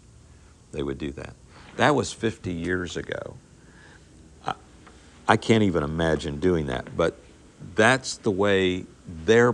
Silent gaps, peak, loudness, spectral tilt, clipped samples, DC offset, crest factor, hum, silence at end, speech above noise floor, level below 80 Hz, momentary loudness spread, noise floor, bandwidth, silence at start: none; -2 dBFS; -25 LUFS; -5 dB/octave; under 0.1%; under 0.1%; 22 dB; none; 0 s; 28 dB; -50 dBFS; 17 LU; -51 dBFS; 11 kHz; 0.75 s